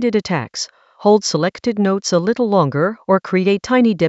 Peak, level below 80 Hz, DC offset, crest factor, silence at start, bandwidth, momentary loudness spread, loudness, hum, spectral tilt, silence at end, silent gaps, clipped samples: -2 dBFS; -58 dBFS; under 0.1%; 16 dB; 0 s; 8.2 kHz; 7 LU; -17 LUFS; none; -5.5 dB/octave; 0 s; none; under 0.1%